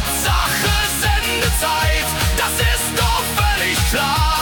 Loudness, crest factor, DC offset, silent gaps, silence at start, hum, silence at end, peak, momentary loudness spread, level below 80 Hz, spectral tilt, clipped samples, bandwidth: -17 LUFS; 12 dB; under 0.1%; none; 0 s; none; 0 s; -4 dBFS; 1 LU; -24 dBFS; -2.5 dB/octave; under 0.1%; 19 kHz